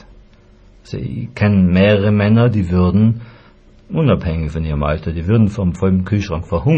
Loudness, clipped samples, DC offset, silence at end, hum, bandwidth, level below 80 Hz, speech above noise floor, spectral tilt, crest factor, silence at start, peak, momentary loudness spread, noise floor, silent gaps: -16 LUFS; under 0.1%; under 0.1%; 0 s; none; 7.8 kHz; -32 dBFS; 31 dB; -9 dB/octave; 14 dB; 0.9 s; 0 dBFS; 12 LU; -45 dBFS; none